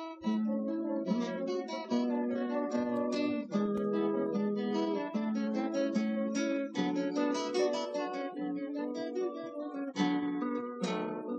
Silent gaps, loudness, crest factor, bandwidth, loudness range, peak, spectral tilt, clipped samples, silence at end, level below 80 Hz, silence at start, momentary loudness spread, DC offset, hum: none; -34 LUFS; 16 dB; 8.6 kHz; 2 LU; -18 dBFS; -6 dB/octave; under 0.1%; 0 s; -80 dBFS; 0 s; 5 LU; under 0.1%; none